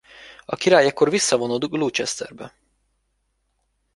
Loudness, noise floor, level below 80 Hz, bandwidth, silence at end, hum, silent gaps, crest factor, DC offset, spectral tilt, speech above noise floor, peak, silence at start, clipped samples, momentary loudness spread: -20 LUFS; -71 dBFS; -64 dBFS; 11.5 kHz; 1.5 s; none; none; 22 dB; under 0.1%; -3 dB/octave; 51 dB; -2 dBFS; 0.2 s; under 0.1%; 23 LU